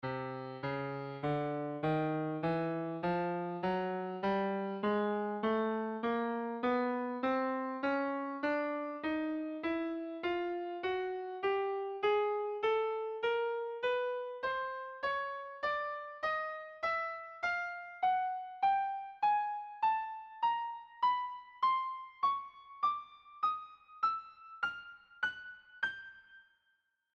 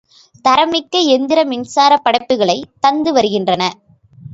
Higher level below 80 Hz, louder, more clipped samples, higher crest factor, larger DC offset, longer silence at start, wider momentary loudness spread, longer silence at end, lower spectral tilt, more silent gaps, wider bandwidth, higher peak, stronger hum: second, -72 dBFS vs -56 dBFS; second, -36 LUFS vs -14 LUFS; neither; about the same, 14 dB vs 14 dB; neither; second, 0.05 s vs 0.45 s; first, 8 LU vs 5 LU; first, 0.75 s vs 0 s; first, -7.5 dB/octave vs -4 dB/octave; neither; second, 7 kHz vs 8 kHz; second, -22 dBFS vs 0 dBFS; neither